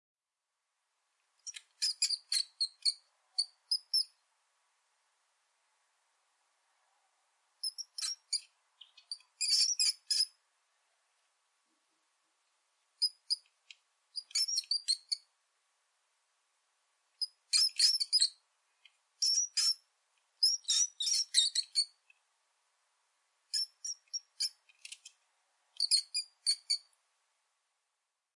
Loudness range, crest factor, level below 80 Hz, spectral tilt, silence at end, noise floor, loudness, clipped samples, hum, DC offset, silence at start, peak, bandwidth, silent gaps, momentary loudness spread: 11 LU; 24 dB; under -90 dBFS; 10.5 dB/octave; 1.55 s; -89 dBFS; -31 LUFS; under 0.1%; none; under 0.1%; 1.45 s; -14 dBFS; 11.5 kHz; none; 15 LU